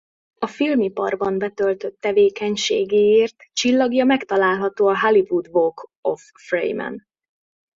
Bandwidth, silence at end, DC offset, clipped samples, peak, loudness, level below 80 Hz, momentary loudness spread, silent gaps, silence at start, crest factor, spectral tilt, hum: 7.6 kHz; 0.75 s; under 0.1%; under 0.1%; -4 dBFS; -20 LUFS; -62 dBFS; 10 LU; 5.96-6.03 s; 0.4 s; 16 dB; -4 dB/octave; none